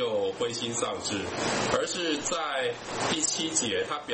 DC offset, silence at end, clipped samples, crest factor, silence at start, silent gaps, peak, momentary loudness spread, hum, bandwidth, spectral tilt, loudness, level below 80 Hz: under 0.1%; 0 s; under 0.1%; 20 dB; 0 s; none; -10 dBFS; 5 LU; none; 8.8 kHz; -2 dB/octave; -28 LUFS; -58 dBFS